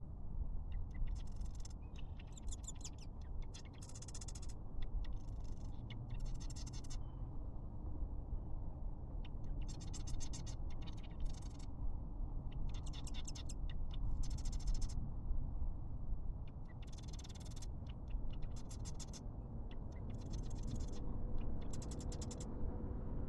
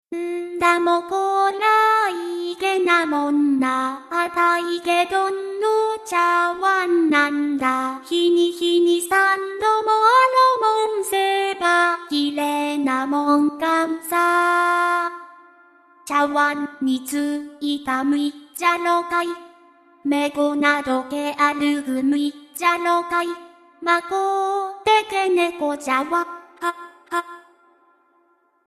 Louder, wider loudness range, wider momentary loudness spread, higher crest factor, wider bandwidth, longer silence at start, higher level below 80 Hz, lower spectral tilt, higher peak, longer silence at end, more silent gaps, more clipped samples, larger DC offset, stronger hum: second, -49 LUFS vs -20 LUFS; about the same, 4 LU vs 5 LU; second, 5 LU vs 10 LU; about the same, 16 dB vs 16 dB; second, 11.5 kHz vs 14 kHz; about the same, 0 s vs 0.1 s; first, -46 dBFS vs -66 dBFS; first, -5.5 dB/octave vs -2.5 dB/octave; second, -26 dBFS vs -4 dBFS; second, 0 s vs 1.3 s; neither; neither; neither; neither